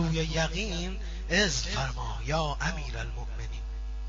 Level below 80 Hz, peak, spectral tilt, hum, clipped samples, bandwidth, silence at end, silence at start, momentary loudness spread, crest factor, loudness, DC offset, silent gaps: -34 dBFS; -12 dBFS; -3.5 dB/octave; none; under 0.1%; 7.6 kHz; 0 s; 0 s; 12 LU; 18 dB; -31 LUFS; under 0.1%; none